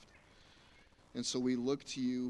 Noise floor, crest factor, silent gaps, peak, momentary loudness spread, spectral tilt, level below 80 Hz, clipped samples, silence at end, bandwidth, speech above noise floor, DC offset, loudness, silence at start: -64 dBFS; 16 dB; none; -24 dBFS; 6 LU; -4 dB/octave; -70 dBFS; under 0.1%; 0 s; 11.5 kHz; 28 dB; under 0.1%; -37 LUFS; 0 s